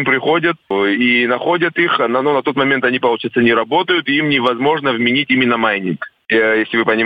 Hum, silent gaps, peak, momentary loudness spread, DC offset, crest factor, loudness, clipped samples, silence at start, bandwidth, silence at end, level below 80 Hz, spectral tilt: none; none; -2 dBFS; 3 LU; under 0.1%; 14 dB; -14 LUFS; under 0.1%; 0 s; 5 kHz; 0 s; -60 dBFS; -7 dB/octave